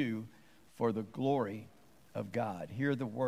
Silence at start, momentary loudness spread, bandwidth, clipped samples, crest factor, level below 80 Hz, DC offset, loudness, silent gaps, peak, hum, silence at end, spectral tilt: 0 s; 12 LU; 15.5 kHz; under 0.1%; 16 dB; -76 dBFS; under 0.1%; -37 LUFS; none; -20 dBFS; none; 0 s; -8 dB/octave